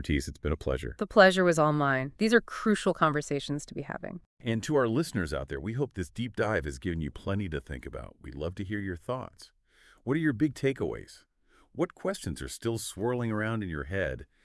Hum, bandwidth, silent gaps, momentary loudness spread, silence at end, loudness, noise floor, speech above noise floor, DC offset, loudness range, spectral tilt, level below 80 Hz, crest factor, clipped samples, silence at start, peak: none; 12 kHz; 4.26-4.37 s; 13 LU; 0.2 s; -30 LUFS; -62 dBFS; 32 dB; under 0.1%; 9 LU; -5.5 dB/octave; -48 dBFS; 24 dB; under 0.1%; 0 s; -6 dBFS